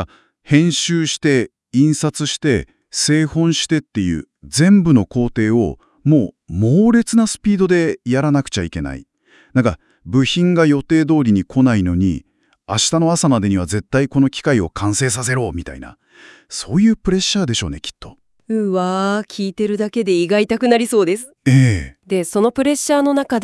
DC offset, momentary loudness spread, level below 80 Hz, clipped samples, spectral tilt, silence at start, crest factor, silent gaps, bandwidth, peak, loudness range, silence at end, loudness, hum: under 0.1%; 9 LU; -42 dBFS; under 0.1%; -5.5 dB/octave; 0 s; 16 dB; none; 12 kHz; 0 dBFS; 4 LU; 0 s; -16 LUFS; none